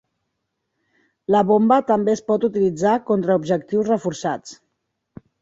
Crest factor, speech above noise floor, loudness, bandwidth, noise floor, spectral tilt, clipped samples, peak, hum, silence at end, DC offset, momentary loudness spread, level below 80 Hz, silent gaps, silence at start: 18 dB; 58 dB; -19 LUFS; 7.8 kHz; -76 dBFS; -6.5 dB/octave; under 0.1%; -2 dBFS; none; 0.85 s; under 0.1%; 10 LU; -62 dBFS; none; 1.3 s